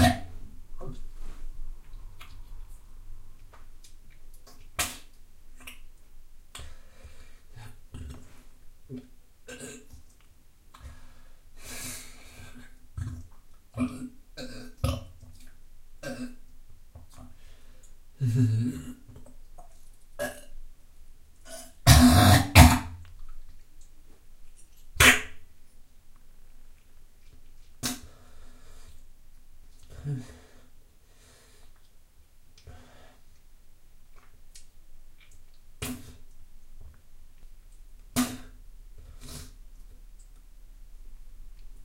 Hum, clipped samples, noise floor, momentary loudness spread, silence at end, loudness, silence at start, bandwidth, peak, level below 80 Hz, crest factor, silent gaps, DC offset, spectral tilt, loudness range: none; under 0.1%; -55 dBFS; 32 LU; 0 s; -24 LUFS; 0 s; 16 kHz; 0 dBFS; -38 dBFS; 30 dB; none; under 0.1%; -4.5 dB/octave; 27 LU